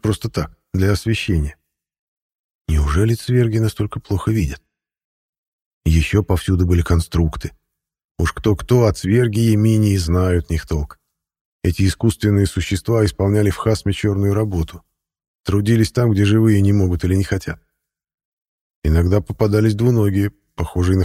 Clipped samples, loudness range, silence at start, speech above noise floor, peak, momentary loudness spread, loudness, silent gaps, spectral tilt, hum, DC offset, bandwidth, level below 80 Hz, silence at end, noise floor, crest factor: under 0.1%; 3 LU; 0.05 s; 60 dB; -2 dBFS; 10 LU; -18 LUFS; 1.99-2.65 s, 5.04-5.81 s, 8.04-8.15 s, 11.41-11.60 s, 15.27-15.44 s, 18.14-18.18 s, 18.25-18.42 s, 18.48-18.82 s; -7 dB/octave; none; under 0.1%; 15 kHz; -30 dBFS; 0 s; -76 dBFS; 16 dB